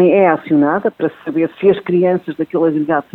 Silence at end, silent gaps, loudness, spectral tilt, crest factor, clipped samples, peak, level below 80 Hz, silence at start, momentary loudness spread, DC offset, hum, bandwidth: 0.1 s; none; -15 LUFS; -10 dB/octave; 14 dB; under 0.1%; 0 dBFS; -58 dBFS; 0 s; 7 LU; under 0.1%; none; 4.2 kHz